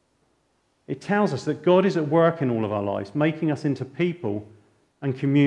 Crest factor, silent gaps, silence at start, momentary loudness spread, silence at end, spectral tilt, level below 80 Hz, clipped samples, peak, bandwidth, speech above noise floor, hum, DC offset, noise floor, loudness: 18 dB; none; 0.9 s; 11 LU; 0 s; -8 dB/octave; -70 dBFS; under 0.1%; -6 dBFS; 9.8 kHz; 46 dB; none; under 0.1%; -68 dBFS; -24 LUFS